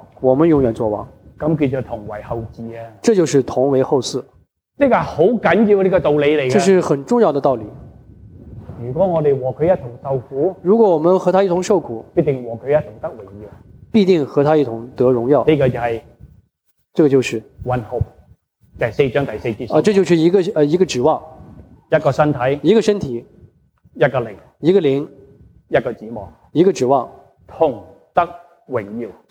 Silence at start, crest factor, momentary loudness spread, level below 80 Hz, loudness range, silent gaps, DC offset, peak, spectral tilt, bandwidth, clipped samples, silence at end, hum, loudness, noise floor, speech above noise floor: 0.2 s; 16 dB; 14 LU; -46 dBFS; 5 LU; none; under 0.1%; -2 dBFS; -6.5 dB/octave; 11 kHz; under 0.1%; 0.2 s; none; -17 LUFS; -65 dBFS; 49 dB